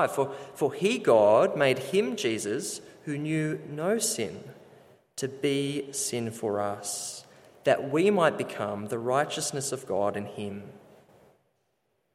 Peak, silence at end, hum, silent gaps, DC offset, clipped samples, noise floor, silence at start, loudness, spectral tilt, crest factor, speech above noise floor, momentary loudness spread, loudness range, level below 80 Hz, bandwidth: -8 dBFS; 1.35 s; none; none; under 0.1%; under 0.1%; -75 dBFS; 0 s; -28 LUFS; -4 dB/octave; 20 dB; 48 dB; 14 LU; 6 LU; -74 dBFS; 15.5 kHz